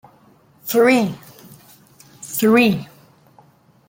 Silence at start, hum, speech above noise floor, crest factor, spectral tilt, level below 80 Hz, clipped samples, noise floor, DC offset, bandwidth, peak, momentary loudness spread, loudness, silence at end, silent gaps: 0.65 s; none; 37 dB; 18 dB; -5 dB/octave; -62 dBFS; under 0.1%; -52 dBFS; under 0.1%; 17 kHz; -2 dBFS; 21 LU; -17 LUFS; 1.05 s; none